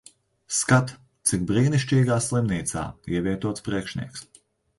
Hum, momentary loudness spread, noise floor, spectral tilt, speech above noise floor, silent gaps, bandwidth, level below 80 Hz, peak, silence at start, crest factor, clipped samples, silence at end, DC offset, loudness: none; 12 LU; -45 dBFS; -5 dB/octave; 22 dB; none; 11.5 kHz; -50 dBFS; -4 dBFS; 0.5 s; 20 dB; under 0.1%; 0.55 s; under 0.1%; -24 LUFS